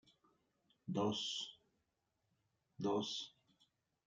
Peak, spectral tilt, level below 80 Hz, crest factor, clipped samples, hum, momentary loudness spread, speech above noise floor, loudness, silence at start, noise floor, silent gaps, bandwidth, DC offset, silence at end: -26 dBFS; -4.5 dB/octave; -86 dBFS; 20 dB; under 0.1%; none; 13 LU; 45 dB; -42 LUFS; 0.85 s; -86 dBFS; none; 9.6 kHz; under 0.1%; 0.8 s